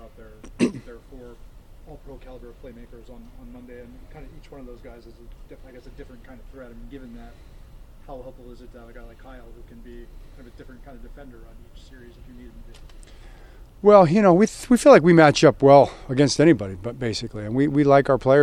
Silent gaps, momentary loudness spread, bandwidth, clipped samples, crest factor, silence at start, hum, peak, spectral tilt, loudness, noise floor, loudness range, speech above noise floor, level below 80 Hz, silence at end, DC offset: none; 28 LU; 14 kHz; under 0.1%; 22 dB; 0.45 s; none; 0 dBFS; -6 dB/octave; -17 LUFS; -44 dBFS; 18 LU; 23 dB; -44 dBFS; 0 s; under 0.1%